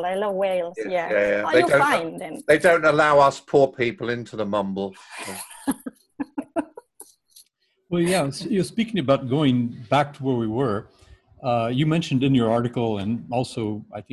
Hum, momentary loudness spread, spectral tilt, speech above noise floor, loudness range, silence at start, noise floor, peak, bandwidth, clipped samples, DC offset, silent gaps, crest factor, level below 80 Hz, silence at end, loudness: none; 15 LU; -6 dB/octave; 40 dB; 11 LU; 0 s; -61 dBFS; -4 dBFS; 13 kHz; under 0.1%; under 0.1%; none; 18 dB; -56 dBFS; 0.1 s; -22 LUFS